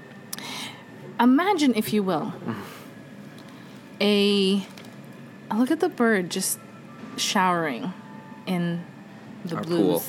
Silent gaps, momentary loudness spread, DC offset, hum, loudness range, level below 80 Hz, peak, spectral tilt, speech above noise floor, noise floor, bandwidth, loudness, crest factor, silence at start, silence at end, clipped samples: none; 23 LU; under 0.1%; none; 3 LU; -74 dBFS; -8 dBFS; -4.5 dB/octave; 20 dB; -43 dBFS; 17.5 kHz; -24 LUFS; 18 dB; 0 s; 0 s; under 0.1%